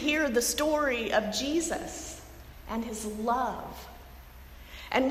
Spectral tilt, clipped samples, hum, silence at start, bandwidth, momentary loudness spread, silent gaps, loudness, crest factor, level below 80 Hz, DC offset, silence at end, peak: -3 dB/octave; under 0.1%; none; 0 s; 16 kHz; 23 LU; none; -29 LUFS; 18 dB; -50 dBFS; under 0.1%; 0 s; -12 dBFS